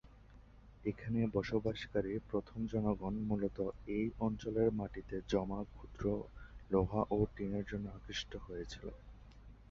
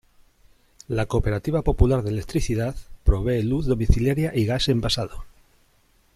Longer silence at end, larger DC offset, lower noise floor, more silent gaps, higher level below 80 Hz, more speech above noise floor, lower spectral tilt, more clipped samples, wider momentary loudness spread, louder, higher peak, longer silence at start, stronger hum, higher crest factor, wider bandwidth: second, 0.05 s vs 0.85 s; neither; about the same, -59 dBFS vs -61 dBFS; neither; second, -54 dBFS vs -30 dBFS; second, 21 dB vs 39 dB; about the same, -6.5 dB/octave vs -6.5 dB/octave; neither; first, 12 LU vs 6 LU; second, -39 LUFS vs -24 LUFS; second, -20 dBFS vs -2 dBFS; second, 0.05 s vs 0.9 s; neither; about the same, 20 dB vs 20 dB; second, 7.4 kHz vs 14.5 kHz